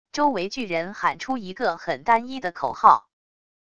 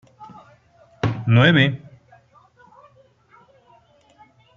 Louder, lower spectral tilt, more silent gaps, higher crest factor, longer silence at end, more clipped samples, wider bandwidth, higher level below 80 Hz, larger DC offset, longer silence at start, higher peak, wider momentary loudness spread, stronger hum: second, -23 LUFS vs -17 LUFS; second, -4.5 dB/octave vs -7.5 dB/octave; neither; about the same, 22 dB vs 22 dB; second, 0.75 s vs 2.8 s; neither; first, 9.4 kHz vs 6.8 kHz; about the same, -60 dBFS vs -58 dBFS; first, 0.4% vs under 0.1%; about the same, 0.15 s vs 0.2 s; about the same, -2 dBFS vs -2 dBFS; about the same, 11 LU vs 13 LU; neither